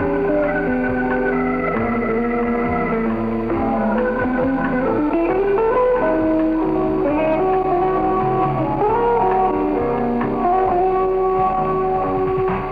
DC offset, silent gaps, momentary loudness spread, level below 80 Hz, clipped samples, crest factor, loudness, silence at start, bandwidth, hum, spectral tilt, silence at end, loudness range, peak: under 0.1%; none; 3 LU; -36 dBFS; under 0.1%; 10 dB; -18 LUFS; 0 s; 4.9 kHz; none; -9.5 dB/octave; 0 s; 2 LU; -6 dBFS